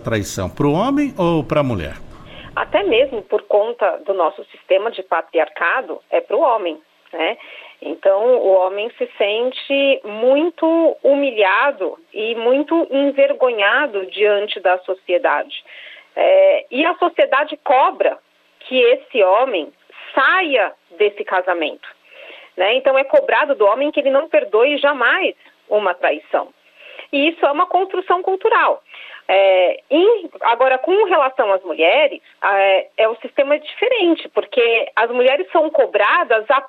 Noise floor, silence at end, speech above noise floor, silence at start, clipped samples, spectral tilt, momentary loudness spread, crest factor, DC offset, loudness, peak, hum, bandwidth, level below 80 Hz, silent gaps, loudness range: -40 dBFS; 0 s; 24 dB; 0 s; under 0.1%; -5 dB/octave; 9 LU; 14 dB; under 0.1%; -16 LUFS; -4 dBFS; none; 10.5 kHz; -52 dBFS; none; 3 LU